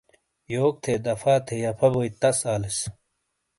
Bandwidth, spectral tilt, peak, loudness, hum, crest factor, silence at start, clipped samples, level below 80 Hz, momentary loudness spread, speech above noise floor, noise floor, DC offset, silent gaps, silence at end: 11.5 kHz; -5 dB/octave; -8 dBFS; -24 LUFS; none; 18 dB; 0.5 s; under 0.1%; -54 dBFS; 7 LU; 53 dB; -77 dBFS; under 0.1%; none; 0.7 s